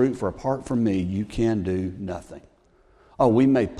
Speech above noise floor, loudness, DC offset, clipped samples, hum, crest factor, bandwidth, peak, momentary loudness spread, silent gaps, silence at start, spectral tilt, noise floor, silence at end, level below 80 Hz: 35 dB; -24 LUFS; under 0.1%; under 0.1%; none; 18 dB; 11 kHz; -6 dBFS; 15 LU; none; 0 s; -8 dB/octave; -58 dBFS; 0 s; -48 dBFS